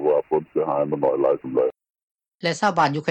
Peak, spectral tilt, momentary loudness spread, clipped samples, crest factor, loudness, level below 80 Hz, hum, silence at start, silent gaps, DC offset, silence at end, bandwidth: -8 dBFS; -5.5 dB/octave; 6 LU; under 0.1%; 14 dB; -22 LUFS; -66 dBFS; none; 0 s; 2.03-2.15 s, 2.28-2.32 s; under 0.1%; 0 s; 9 kHz